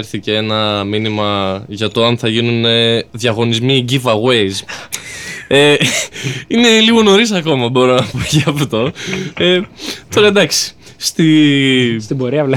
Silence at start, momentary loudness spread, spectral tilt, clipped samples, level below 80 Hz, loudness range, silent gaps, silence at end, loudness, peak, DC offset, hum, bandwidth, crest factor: 0 s; 12 LU; -4.5 dB/octave; under 0.1%; -46 dBFS; 3 LU; none; 0 s; -13 LUFS; -2 dBFS; under 0.1%; none; 17.5 kHz; 12 dB